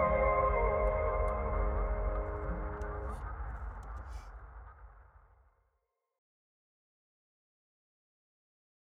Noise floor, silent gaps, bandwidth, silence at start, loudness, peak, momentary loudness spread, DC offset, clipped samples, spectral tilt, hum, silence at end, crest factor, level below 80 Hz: -82 dBFS; none; 3.6 kHz; 0 s; -35 LUFS; -18 dBFS; 21 LU; under 0.1%; under 0.1%; -9 dB/octave; none; 3.95 s; 18 dB; -40 dBFS